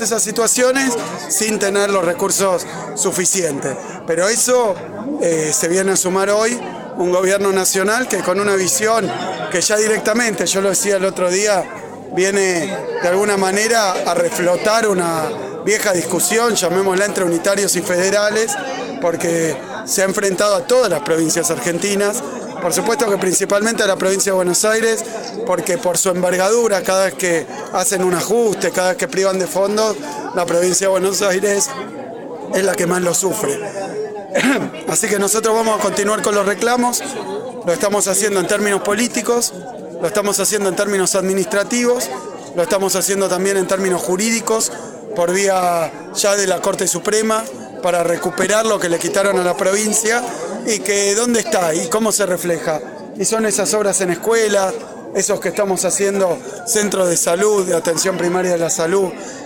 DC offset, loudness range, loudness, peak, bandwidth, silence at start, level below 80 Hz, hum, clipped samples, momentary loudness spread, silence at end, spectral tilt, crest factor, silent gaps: under 0.1%; 1 LU; -16 LUFS; -4 dBFS; 17.5 kHz; 0 s; -58 dBFS; none; under 0.1%; 8 LU; 0 s; -3 dB/octave; 14 dB; none